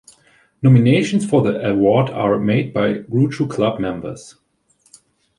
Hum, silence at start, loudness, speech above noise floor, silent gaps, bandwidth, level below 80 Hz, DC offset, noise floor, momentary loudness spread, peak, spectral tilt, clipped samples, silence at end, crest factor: none; 0.6 s; -17 LUFS; 44 dB; none; 11 kHz; -52 dBFS; under 0.1%; -60 dBFS; 11 LU; -2 dBFS; -7.5 dB/octave; under 0.1%; 1.1 s; 16 dB